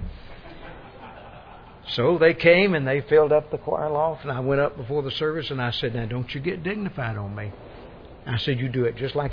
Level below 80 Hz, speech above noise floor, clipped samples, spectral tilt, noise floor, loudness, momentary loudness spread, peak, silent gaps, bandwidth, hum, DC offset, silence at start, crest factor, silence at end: -48 dBFS; 22 dB; under 0.1%; -8 dB/octave; -44 dBFS; -23 LUFS; 24 LU; -4 dBFS; none; 5.4 kHz; none; under 0.1%; 0 s; 20 dB; 0 s